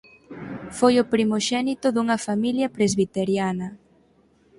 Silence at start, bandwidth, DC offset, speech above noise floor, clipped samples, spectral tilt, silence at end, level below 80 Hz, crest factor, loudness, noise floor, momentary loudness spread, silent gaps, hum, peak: 0.3 s; 11.5 kHz; under 0.1%; 38 dB; under 0.1%; -5 dB/octave; 0.85 s; -58 dBFS; 20 dB; -22 LUFS; -59 dBFS; 17 LU; none; none; -4 dBFS